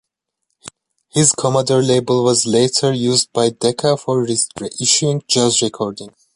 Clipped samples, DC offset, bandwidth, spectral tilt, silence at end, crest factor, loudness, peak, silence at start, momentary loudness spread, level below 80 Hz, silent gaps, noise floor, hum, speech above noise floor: under 0.1%; under 0.1%; 11.5 kHz; -4 dB/octave; 0.25 s; 16 dB; -16 LUFS; 0 dBFS; 0.65 s; 7 LU; -56 dBFS; none; -74 dBFS; none; 58 dB